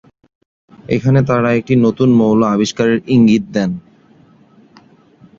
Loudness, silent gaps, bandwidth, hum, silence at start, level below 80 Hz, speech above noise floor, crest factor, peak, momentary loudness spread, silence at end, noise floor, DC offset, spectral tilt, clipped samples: -13 LUFS; none; 7.6 kHz; none; 0.9 s; -48 dBFS; 35 dB; 14 dB; 0 dBFS; 8 LU; 1.6 s; -47 dBFS; under 0.1%; -7 dB/octave; under 0.1%